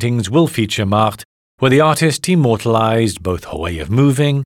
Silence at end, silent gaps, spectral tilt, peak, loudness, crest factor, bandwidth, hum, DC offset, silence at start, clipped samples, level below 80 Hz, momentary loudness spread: 0 s; 1.25-1.58 s; -6 dB/octave; -2 dBFS; -15 LUFS; 12 dB; 16.5 kHz; none; under 0.1%; 0 s; under 0.1%; -44 dBFS; 10 LU